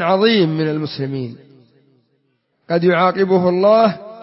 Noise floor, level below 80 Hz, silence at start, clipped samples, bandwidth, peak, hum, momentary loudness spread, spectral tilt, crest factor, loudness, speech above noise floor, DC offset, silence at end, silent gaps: -65 dBFS; -64 dBFS; 0 s; under 0.1%; 5.8 kHz; -2 dBFS; none; 11 LU; -10.5 dB/octave; 14 dB; -16 LUFS; 50 dB; under 0.1%; 0 s; none